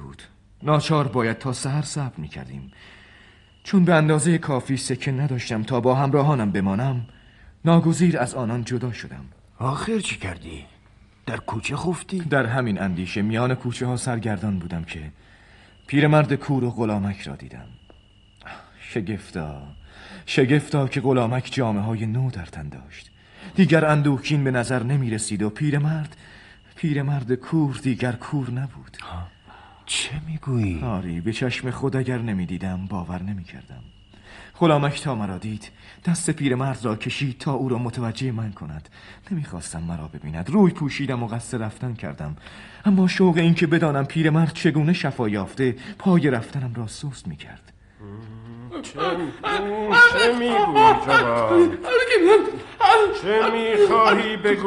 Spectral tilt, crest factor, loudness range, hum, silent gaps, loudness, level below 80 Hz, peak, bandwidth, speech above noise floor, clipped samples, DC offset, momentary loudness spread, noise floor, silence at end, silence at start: -6 dB/octave; 20 dB; 10 LU; none; none; -22 LUFS; -50 dBFS; -2 dBFS; 11.5 kHz; 31 dB; under 0.1%; under 0.1%; 19 LU; -53 dBFS; 0 s; 0 s